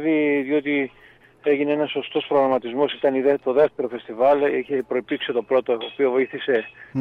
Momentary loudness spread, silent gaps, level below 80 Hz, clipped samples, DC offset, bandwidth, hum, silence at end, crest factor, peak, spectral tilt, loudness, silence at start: 6 LU; none; -66 dBFS; under 0.1%; under 0.1%; 4.5 kHz; none; 0 s; 14 dB; -6 dBFS; -7.5 dB/octave; -22 LUFS; 0 s